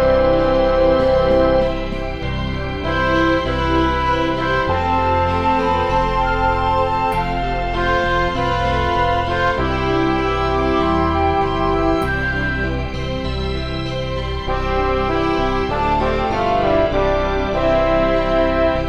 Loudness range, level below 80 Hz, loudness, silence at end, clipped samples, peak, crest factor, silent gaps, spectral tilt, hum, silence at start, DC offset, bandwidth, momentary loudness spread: 3 LU; -26 dBFS; -18 LUFS; 0 s; under 0.1%; -2 dBFS; 14 dB; none; -7 dB/octave; none; 0 s; 2%; 15 kHz; 8 LU